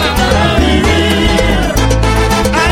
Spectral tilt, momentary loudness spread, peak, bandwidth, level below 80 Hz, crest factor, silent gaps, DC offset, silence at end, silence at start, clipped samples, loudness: -5 dB/octave; 2 LU; 0 dBFS; 17 kHz; -16 dBFS; 10 dB; none; under 0.1%; 0 s; 0 s; under 0.1%; -11 LUFS